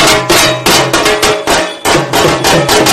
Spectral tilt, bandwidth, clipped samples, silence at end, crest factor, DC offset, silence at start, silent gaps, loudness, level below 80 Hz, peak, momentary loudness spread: -2.5 dB/octave; over 20 kHz; 0.5%; 0 s; 8 dB; under 0.1%; 0 s; none; -8 LUFS; -32 dBFS; 0 dBFS; 4 LU